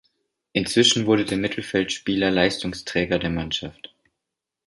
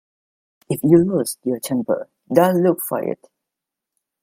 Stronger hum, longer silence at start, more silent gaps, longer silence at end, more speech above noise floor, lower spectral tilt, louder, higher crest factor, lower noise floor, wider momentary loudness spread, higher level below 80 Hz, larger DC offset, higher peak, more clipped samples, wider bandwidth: neither; second, 0.55 s vs 0.7 s; neither; second, 0.95 s vs 1.1 s; second, 62 dB vs 66 dB; second, -4 dB/octave vs -6.5 dB/octave; second, -22 LUFS vs -19 LUFS; about the same, 20 dB vs 20 dB; about the same, -84 dBFS vs -84 dBFS; about the same, 11 LU vs 11 LU; first, -48 dBFS vs -58 dBFS; neither; second, -4 dBFS vs 0 dBFS; neither; second, 11.5 kHz vs 16.5 kHz